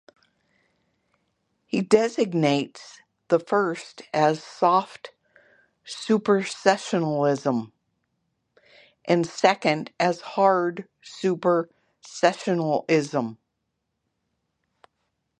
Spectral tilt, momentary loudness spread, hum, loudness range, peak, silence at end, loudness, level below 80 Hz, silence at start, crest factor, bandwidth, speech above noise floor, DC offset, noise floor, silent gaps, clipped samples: -5.5 dB/octave; 15 LU; none; 3 LU; -2 dBFS; 2.05 s; -23 LUFS; -72 dBFS; 1.75 s; 22 dB; 10.5 kHz; 55 dB; under 0.1%; -79 dBFS; none; under 0.1%